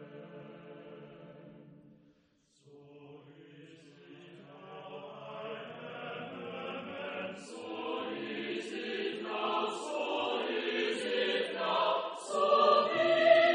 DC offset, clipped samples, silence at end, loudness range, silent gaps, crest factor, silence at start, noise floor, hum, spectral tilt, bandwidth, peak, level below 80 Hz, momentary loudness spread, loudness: under 0.1%; under 0.1%; 0 s; 24 LU; none; 24 dB; 0 s; -70 dBFS; none; -4 dB/octave; 10 kHz; -10 dBFS; -84 dBFS; 26 LU; -33 LUFS